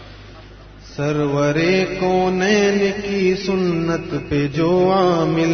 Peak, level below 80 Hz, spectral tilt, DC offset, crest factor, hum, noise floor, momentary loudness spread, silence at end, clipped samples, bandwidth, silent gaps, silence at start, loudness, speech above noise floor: -4 dBFS; -44 dBFS; -6 dB/octave; under 0.1%; 14 dB; none; -40 dBFS; 7 LU; 0 s; under 0.1%; 6.6 kHz; none; 0 s; -18 LUFS; 22 dB